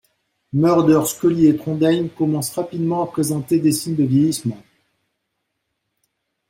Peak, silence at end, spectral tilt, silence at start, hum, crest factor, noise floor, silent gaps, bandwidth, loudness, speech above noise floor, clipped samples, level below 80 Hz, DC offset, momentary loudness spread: -4 dBFS; 1.9 s; -6.5 dB/octave; 0.55 s; none; 16 dB; -75 dBFS; none; 16.5 kHz; -18 LUFS; 58 dB; under 0.1%; -58 dBFS; under 0.1%; 8 LU